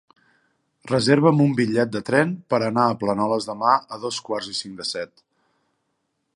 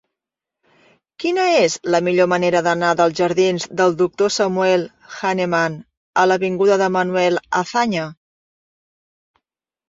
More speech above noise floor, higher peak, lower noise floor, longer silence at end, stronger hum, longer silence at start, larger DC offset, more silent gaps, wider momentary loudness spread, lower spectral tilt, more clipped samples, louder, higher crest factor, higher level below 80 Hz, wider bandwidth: second, 53 dB vs 68 dB; about the same, -2 dBFS vs -2 dBFS; second, -74 dBFS vs -85 dBFS; second, 1.3 s vs 1.75 s; neither; second, 0.85 s vs 1.2 s; neither; second, none vs 5.97-6.13 s; first, 12 LU vs 7 LU; about the same, -5.5 dB/octave vs -4.5 dB/octave; neither; second, -21 LUFS vs -18 LUFS; about the same, 20 dB vs 16 dB; about the same, -62 dBFS vs -62 dBFS; first, 11.5 kHz vs 7.8 kHz